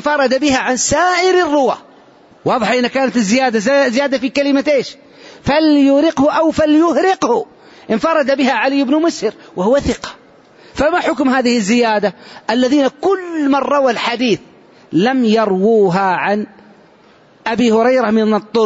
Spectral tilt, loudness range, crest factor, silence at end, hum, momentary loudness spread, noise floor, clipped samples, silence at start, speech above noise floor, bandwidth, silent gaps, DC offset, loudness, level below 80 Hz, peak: -4.5 dB/octave; 3 LU; 12 dB; 0 s; none; 9 LU; -47 dBFS; under 0.1%; 0 s; 33 dB; 8 kHz; none; under 0.1%; -14 LUFS; -46 dBFS; -2 dBFS